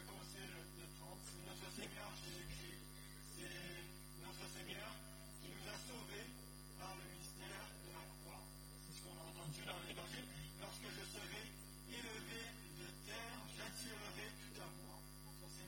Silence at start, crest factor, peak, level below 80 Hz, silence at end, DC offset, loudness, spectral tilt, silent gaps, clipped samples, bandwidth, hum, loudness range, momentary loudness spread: 0 s; 18 dB; -36 dBFS; -64 dBFS; 0 s; under 0.1%; -53 LUFS; -3 dB/octave; none; under 0.1%; 17 kHz; 50 Hz at -60 dBFS; 2 LU; 6 LU